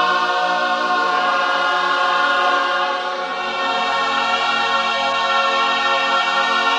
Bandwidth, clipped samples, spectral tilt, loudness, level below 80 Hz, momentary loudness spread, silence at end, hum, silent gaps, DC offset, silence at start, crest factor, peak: 11.5 kHz; under 0.1%; -1.5 dB/octave; -17 LUFS; -72 dBFS; 4 LU; 0 s; none; none; under 0.1%; 0 s; 14 dB; -4 dBFS